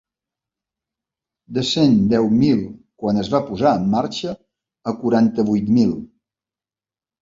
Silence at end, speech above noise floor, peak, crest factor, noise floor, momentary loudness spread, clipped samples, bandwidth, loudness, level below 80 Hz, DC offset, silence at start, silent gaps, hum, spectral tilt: 1.15 s; over 73 dB; -4 dBFS; 16 dB; under -90 dBFS; 13 LU; under 0.1%; 7.6 kHz; -18 LUFS; -52 dBFS; under 0.1%; 1.5 s; none; none; -7 dB/octave